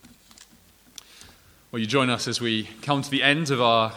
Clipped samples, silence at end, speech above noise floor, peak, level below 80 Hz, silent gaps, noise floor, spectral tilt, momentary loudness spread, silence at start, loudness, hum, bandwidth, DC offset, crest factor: under 0.1%; 0 s; 32 dB; -4 dBFS; -64 dBFS; none; -56 dBFS; -4 dB/octave; 20 LU; 0.4 s; -23 LUFS; none; over 20 kHz; under 0.1%; 22 dB